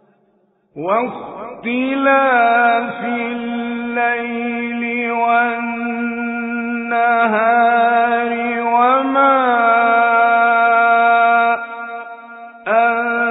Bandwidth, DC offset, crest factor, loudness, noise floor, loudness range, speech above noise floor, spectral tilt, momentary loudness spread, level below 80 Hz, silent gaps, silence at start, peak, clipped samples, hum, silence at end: 4 kHz; under 0.1%; 14 dB; -15 LUFS; -59 dBFS; 6 LU; 42 dB; -2 dB/octave; 12 LU; -62 dBFS; none; 0.75 s; -2 dBFS; under 0.1%; none; 0 s